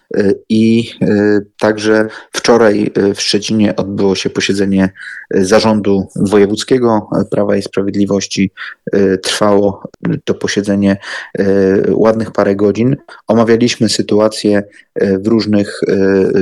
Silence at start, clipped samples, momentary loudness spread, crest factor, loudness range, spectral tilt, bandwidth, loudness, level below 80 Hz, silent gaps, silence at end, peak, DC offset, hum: 0.1 s; under 0.1%; 6 LU; 12 dB; 2 LU; -5.5 dB/octave; 12.5 kHz; -13 LUFS; -48 dBFS; none; 0 s; 0 dBFS; under 0.1%; none